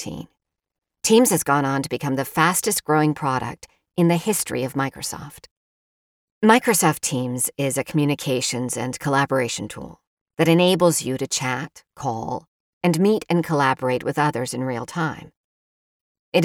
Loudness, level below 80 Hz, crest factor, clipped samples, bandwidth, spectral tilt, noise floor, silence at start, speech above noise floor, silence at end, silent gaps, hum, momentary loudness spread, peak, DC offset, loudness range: -21 LUFS; -58 dBFS; 20 dB; under 0.1%; 19 kHz; -4.5 dB/octave; under -90 dBFS; 0 s; over 69 dB; 0 s; 5.51-6.41 s, 10.07-10.26 s, 12.48-12.81 s, 15.37-16.32 s; none; 15 LU; -2 dBFS; under 0.1%; 3 LU